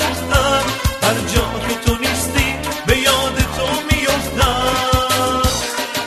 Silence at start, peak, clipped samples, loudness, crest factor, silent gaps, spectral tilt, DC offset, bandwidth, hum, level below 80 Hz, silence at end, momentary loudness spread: 0 s; 0 dBFS; under 0.1%; -16 LUFS; 16 dB; none; -3.5 dB/octave; under 0.1%; 13.5 kHz; none; -26 dBFS; 0 s; 5 LU